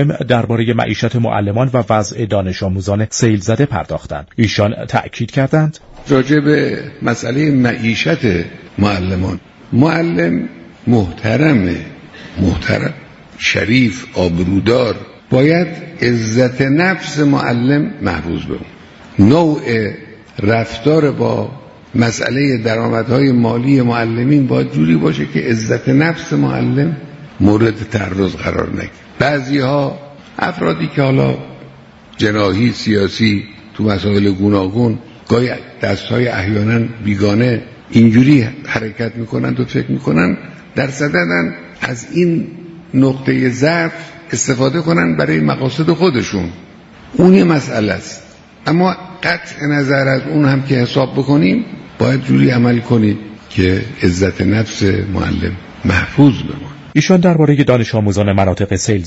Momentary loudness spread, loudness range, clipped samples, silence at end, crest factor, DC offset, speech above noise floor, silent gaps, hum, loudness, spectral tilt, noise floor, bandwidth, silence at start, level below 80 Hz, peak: 10 LU; 3 LU; under 0.1%; 0 s; 14 dB; under 0.1%; 26 dB; none; none; -14 LUFS; -6.5 dB/octave; -39 dBFS; 8 kHz; 0 s; -40 dBFS; 0 dBFS